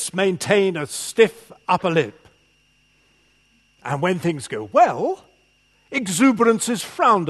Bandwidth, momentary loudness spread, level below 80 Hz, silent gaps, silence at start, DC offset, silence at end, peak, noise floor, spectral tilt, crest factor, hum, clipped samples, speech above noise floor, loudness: 13 kHz; 11 LU; -64 dBFS; none; 0 s; under 0.1%; 0 s; 0 dBFS; -60 dBFS; -4.5 dB/octave; 20 dB; 50 Hz at -55 dBFS; under 0.1%; 41 dB; -20 LUFS